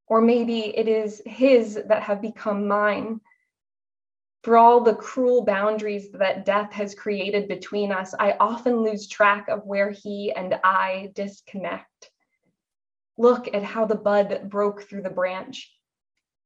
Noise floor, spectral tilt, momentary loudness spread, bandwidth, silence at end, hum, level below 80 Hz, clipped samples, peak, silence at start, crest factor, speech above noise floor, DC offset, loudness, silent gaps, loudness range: -74 dBFS; -5.5 dB/octave; 13 LU; 8 kHz; 0.8 s; none; -74 dBFS; under 0.1%; -4 dBFS; 0.1 s; 18 dB; 52 dB; under 0.1%; -22 LUFS; none; 6 LU